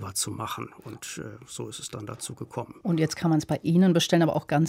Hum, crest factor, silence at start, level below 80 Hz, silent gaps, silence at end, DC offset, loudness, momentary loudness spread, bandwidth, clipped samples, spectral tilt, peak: none; 18 dB; 0 s; -62 dBFS; none; 0 s; under 0.1%; -27 LUFS; 17 LU; 16 kHz; under 0.1%; -5.5 dB/octave; -8 dBFS